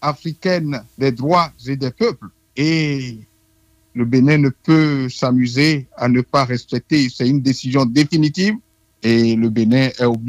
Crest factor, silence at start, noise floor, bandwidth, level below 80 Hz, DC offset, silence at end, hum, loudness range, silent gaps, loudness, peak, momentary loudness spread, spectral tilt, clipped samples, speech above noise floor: 14 dB; 0 s; -57 dBFS; 12 kHz; -52 dBFS; under 0.1%; 0 s; none; 4 LU; none; -17 LUFS; -2 dBFS; 9 LU; -6.5 dB/octave; under 0.1%; 41 dB